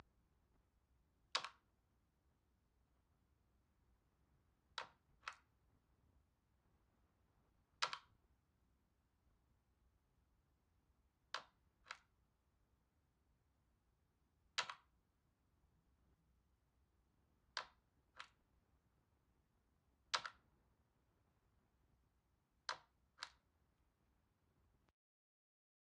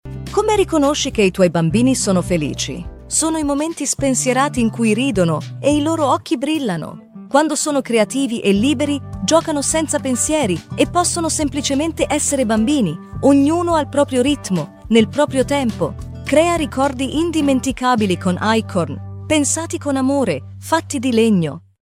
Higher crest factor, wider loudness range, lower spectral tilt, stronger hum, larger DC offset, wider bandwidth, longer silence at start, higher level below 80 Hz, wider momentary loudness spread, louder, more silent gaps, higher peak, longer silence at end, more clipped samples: first, 38 dB vs 16 dB; first, 7 LU vs 2 LU; second, 0 dB/octave vs -4.5 dB/octave; neither; neither; second, 8.8 kHz vs 16 kHz; first, 1.35 s vs 0.05 s; second, -84 dBFS vs -40 dBFS; first, 16 LU vs 6 LU; second, -50 LUFS vs -17 LUFS; neither; second, -20 dBFS vs 0 dBFS; first, 2.7 s vs 0.3 s; neither